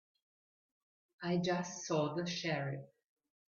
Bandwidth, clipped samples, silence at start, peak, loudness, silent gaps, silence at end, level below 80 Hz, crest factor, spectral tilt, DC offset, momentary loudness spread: 7.2 kHz; under 0.1%; 1.2 s; -24 dBFS; -37 LUFS; none; 0.7 s; -78 dBFS; 16 dB; -5 dB/octave; under 0.1%; 9 LU